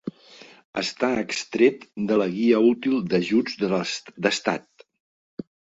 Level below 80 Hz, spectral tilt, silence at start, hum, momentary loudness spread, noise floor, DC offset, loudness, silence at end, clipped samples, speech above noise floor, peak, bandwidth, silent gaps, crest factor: -66 dBFS; -5 dB/octave; 0.05 s; none; 16 LU; -49 dBFS; under 0.1%; -23 LUFS; 0.35 s; under 0.1%; 26 dB; -4 dBFS; 8 kHz; 0.65-0.73 s, 5.00-5.37 s; 20 dB